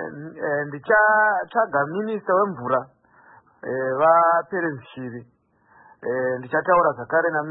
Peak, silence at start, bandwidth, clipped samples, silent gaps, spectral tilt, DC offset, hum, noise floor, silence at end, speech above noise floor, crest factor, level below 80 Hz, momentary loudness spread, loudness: -6 dBFS; 0 s; 4 kHz; under 0.1%; none; -11 dB/octave; under 0.1%; none; -56 dBFS; 0 s; 35 dB; 16 dB; -64 dBFS; 17 LU; -21 LUFS